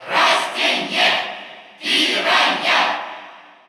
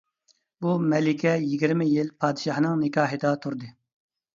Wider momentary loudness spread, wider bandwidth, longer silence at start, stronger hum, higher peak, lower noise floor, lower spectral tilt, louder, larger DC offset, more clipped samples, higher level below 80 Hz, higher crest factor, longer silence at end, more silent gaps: first, 17 LU vs 8 LU; first, over 20 kHz vs 7.6 kHz; second, 0 s vs 0.6 s; neither; first, -4 dBFS vs -8 dBFS; second, -41 dBFS vs -68 dBFS; second, -1 dB/octave vs -7 dB/octave; first, -16 LUFS vs -25 LUFS; neither; neither; second, -84 dBFS vs -70 dBFS; about the same, 16 dB vs 18 dB; second, 0.3 s vs 0.65 s; neither